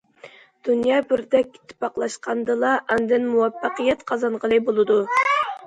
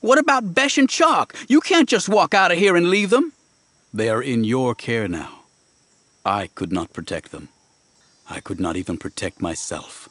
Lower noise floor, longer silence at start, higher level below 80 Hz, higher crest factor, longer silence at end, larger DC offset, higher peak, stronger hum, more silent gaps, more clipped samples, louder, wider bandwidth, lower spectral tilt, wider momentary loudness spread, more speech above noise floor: second, -47 dBFS vs -60 dBFS; first, 0.25 s vs 0.05 s; about the same, -60 dBFS vs -56 dBFS; about the same, 16 dB vs 18 dB; about the same, 0 s vs 0.05 s; neither; second, -6 dBFS vs -2 dBFS; neither; neither; neither; about the same, -21 LUFS vs -19 LUFS; second, 9.6 kHz vs 11 kHz; about the same, -4.5 dB/octave vs -4 dB/octave; second, 8 LU vs 16 LU; second, 26 dB vs 41 dB